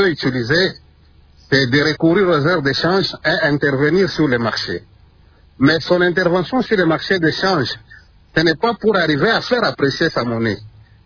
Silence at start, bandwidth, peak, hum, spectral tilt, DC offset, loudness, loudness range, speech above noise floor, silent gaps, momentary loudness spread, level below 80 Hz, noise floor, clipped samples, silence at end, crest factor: 0 s; 5.4 kHz; -2 dBFS; none; -6 dB/octave; under 0.1%; -16 LUFS; 2 LU; 33 dB; none; 6 LU; -46 dBFS; -49 dBFS; under 0.1%; 0.35 s; 16 dB